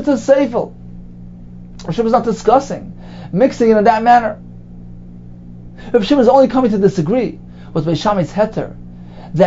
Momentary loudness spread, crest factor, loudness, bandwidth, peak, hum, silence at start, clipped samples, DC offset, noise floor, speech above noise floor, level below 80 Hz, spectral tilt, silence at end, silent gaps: 25 LU; 16 dB; -14 LUFS; 7.8 kHz; 0 dBFS; 60 Hz at -40 dBFS; 0 s; under 0.1%; under 0.1%; -34 dBFS; 20 dB; -38 dBFS; -7 dB/octave; 0 s; none